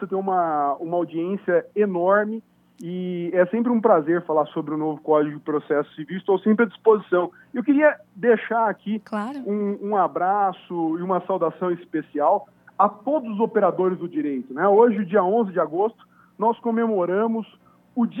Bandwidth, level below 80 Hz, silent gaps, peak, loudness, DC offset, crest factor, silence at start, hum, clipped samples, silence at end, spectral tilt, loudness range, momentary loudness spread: 3.9 kHz; -76 dBFS; none; -2 dBFS; -22 LUFS; under 0.1%; 20 dB; 0 s; none; under 0.1%; 0 s; -9 dB/octave; 3 LU; 10 LU